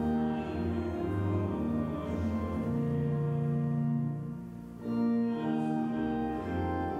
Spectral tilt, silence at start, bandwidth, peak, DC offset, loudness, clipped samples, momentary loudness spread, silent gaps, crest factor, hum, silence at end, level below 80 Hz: -9.5 dB/octave; 0 s; 7.2 kHz; -20 dBFS; under 0.1%; -32 LUFS; under 0.1%; 4 LU; none; 12 dB; none; 0 s; -50 dBFS